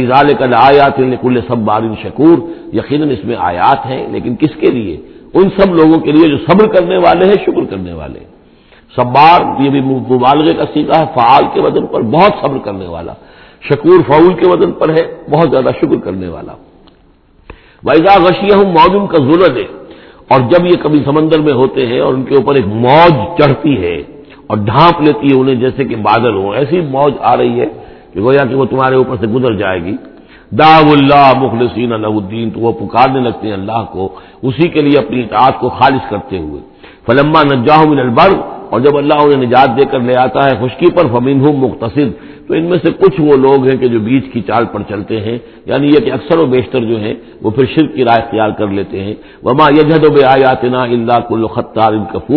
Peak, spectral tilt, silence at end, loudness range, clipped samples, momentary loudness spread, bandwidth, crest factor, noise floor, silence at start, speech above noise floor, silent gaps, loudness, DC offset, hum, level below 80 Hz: 0 dBFS; -9 dB/octave; 0 s; 4 LU; 1%; 12 LU; 5.4 kHz; 10 dB; -46 dBFS; 0 s; 36 dB; none; -10 LUFS; under 0.1%; none; -40 dBFS